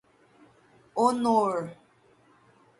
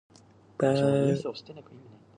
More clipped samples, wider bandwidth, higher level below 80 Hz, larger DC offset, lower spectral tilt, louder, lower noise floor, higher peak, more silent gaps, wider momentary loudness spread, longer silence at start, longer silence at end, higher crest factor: neither; first, 11.5 kHz vs 10 kHz; second, -74 dBFS vs -68 dBFS; neither; second, -6 dB/octave vs -7.5 dB/octave; about the same, -26 LUFS vs -27 LUFS; first, -61 dBFS vs -47 dBFS; about the same, -10 dBFS vs -12 dBFS; neither; second, 13 LU vs 24 LU; first, 0.95 s vs 0.6 s; first, 1.05 s vs 0.4 s; about the same, 20 dB vs 16 dB